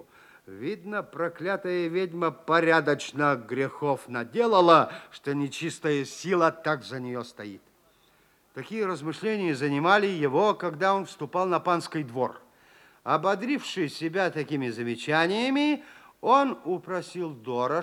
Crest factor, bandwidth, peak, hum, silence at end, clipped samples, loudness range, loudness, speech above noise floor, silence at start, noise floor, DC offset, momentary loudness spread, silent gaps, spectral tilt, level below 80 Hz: 22 dB; 16.5 kHz; -4 dBFS; none; 0 s; under 0.1%; 6 LU; -27 LUFS; 37 dB; 0.5 s; -63 dBFS; under 0.1%; 12 LU; none; -5.5 dB/octave; -76 dBFS